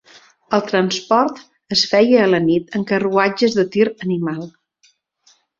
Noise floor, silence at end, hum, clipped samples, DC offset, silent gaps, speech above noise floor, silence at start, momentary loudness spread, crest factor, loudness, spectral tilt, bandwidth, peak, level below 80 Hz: -59 dBFS; 1.1 s; none; under 0.1%; under 0.1%; none; 43 dB; 0.5 s; 9 LU; 16 dB; -17 LUFS; -5 dB/octave; 7.6 kHz; -2 dBFS; -60 dBFS